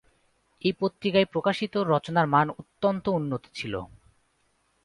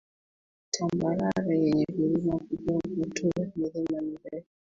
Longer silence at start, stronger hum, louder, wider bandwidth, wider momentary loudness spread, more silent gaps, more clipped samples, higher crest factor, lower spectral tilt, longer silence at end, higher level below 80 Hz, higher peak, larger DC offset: about the same, 0.65 s vs 0.75 s; neither; first, -26 LUFS vs -29 LUFS; first, 11.5 kHz vs 7.8 kHz; about the same, 10 LU vs 8 LU; neither; neither; about the same, 20 dB vs 16 dB; about the same, -7 dB/octave vs -6 dB/octave; first, 1 s vs 0.25 s; about the same, -60 dBFS vs -58 dBFS; first, -8 dBFS vs -14 dBFS; neither